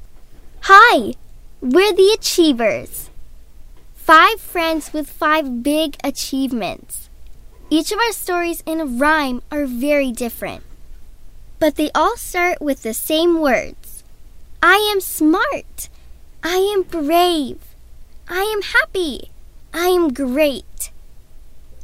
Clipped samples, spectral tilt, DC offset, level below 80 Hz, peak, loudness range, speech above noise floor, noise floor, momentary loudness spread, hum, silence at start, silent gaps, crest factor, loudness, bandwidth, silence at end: under 0.1%; -2.5 dB/octave; under 0.1%; -40 dBFS; 0 dBFS; 6 LU; 22 dB; -38 dBFS; 17 LU; none; 0 s; none; 18 dB; -16 LUFS; 16.5 kHz; 0 s